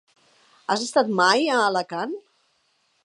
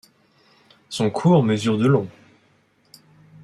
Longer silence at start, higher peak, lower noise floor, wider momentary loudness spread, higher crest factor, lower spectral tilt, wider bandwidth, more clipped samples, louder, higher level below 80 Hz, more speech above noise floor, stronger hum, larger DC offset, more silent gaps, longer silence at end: second, 0.7 s vs 0.9 s; about the same, -4 dBFS vs -4 dBFS; first, -67 dBFS vs -60 dBFS; about the same, 15 LU vs 13 LU; about the same, 20 dB vs 18 dB; second, -3 dB/octave vs -7 dB/octave; about the same, 11.5 kHz vs 12 kHz; neither; second, -22 LUFS vs -19 LUFS; second, -80 dBFS vs -62 dBFS; first, 46 dB vs 42 dB; neither; neither; neither; second, 0.85 s vs 1.35 s